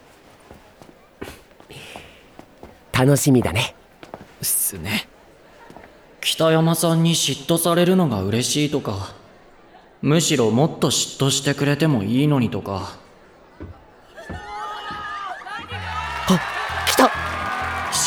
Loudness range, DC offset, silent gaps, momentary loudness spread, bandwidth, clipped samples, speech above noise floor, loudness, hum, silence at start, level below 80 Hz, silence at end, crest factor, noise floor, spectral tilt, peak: 8 LU; under 0.1%; none; 21 LU; over 20 kHz; under 0.1%; 30 dB; -20 LUFS; none; 0.5 s; -48 dBFS; 0 s; 20 dB; -49 dBFS; -4.5 dB/octave; -2 dBFS